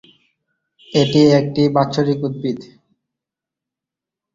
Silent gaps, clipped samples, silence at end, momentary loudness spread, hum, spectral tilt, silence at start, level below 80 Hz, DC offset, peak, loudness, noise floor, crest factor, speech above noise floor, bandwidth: none; under 0.1%; 1.7 s; 12 LU; none; -7 dB/octave; 0.9 s; -56 dBFS; under 0.1%; -2 dBFS; -16 LUFS; -86 dBFS; 18 dB; 71 dB; 7.6 kHz